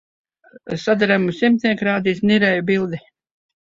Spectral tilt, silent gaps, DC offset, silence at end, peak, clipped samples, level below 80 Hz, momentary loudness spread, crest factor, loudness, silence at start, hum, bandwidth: -6.5 dB/octave; none; under 0.1%; 0.65 s; -2 dBFS; under 0.1%; -58 dBFS; 10 LU; 16 dB; -18 LUFS; 0.65 s; none; 7.6 kHz